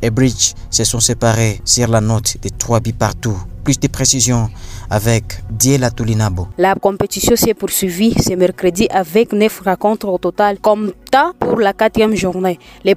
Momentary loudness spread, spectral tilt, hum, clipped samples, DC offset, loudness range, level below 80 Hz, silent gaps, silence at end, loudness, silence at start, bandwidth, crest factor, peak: 6 LU; -4.5 dB/octave; none; under 0.1%; under 0.1%; 1 LU; -32 dBFS; none; 0 s; -14 LUFS; 0 s; 16 kHz; 14 dB; 0 dBFS